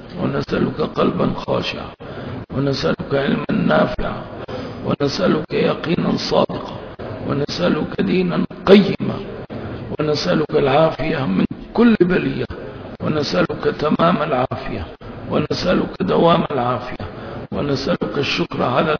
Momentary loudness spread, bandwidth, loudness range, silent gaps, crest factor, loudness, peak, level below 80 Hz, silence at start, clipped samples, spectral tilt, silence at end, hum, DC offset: 14 LU; 5.4 kHz; 3 LU; none; 18 dB; -19 LUFS; 0 dBFS; -40 dBFS; 0 s; under 0.1%; -7 dB/octave; 0 s; none; under 0.1%